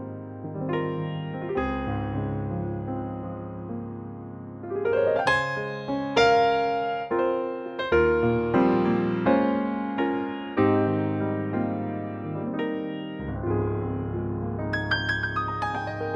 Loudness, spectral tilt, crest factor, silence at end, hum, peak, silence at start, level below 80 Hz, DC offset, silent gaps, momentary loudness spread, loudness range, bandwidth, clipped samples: -26 LUFS; -7 dB/octave; 18 dB; 0 s; none; -8 dBFS; 0 s; -46 dBFS; under 0.1%; none; 12 LU; 7 LU; 9.6 kHz; under 0.1%